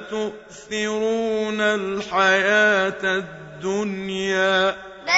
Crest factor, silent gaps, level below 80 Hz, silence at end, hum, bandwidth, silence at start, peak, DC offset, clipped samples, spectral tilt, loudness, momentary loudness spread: 18 dB; none; -58 dBFS; 0 s; none; 8 kHz; 0 s; -4 dBFS; under 0.1%; under 0.1%; -3.5 dB/octave; -21 LUFS; 14 LU